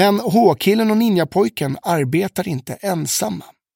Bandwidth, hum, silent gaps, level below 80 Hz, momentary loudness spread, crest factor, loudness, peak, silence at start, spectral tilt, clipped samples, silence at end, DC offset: 17 kHz; none; none; -58 dBFS; 10 LU; 16 dB; -18 LUFS; -2 dBFS; 0 s; -5 dB/octave; under 0.1%; 0.3 s; under 0.1%